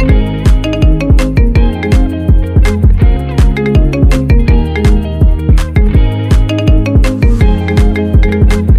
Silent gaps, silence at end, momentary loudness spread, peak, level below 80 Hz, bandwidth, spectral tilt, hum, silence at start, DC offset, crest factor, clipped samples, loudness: none; 0 s; 2 LU; 0 dBFS; -10 dBFS; 11 kHz; -7.5 dB/octave; none; 0 s; under 0.1%; 8 dB; under 0.1%; -10 LUFS